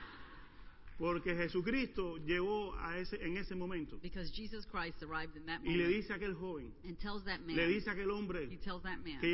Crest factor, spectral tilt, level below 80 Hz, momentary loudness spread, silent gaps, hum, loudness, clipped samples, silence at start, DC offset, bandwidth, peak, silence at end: 18 dB; -4 dB/octave; -54 dBFS; 12 LU; none; none; -40 LUFS; under 0.1%; 0 s; under 0.1%; 5.8 kHz; -22 dBFS; 0 s